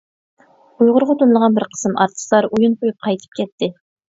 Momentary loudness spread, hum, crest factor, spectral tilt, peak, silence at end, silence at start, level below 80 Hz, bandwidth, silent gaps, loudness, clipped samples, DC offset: 10 LU; none; 16 dB; -5.5 dB/octave; 0 dBFS; 0.45 s; 0.8 s; -62 dBFS; 7.8 kHz; 3.52-3.58 s; -17 LUFS; under 0.1%; under 0.1%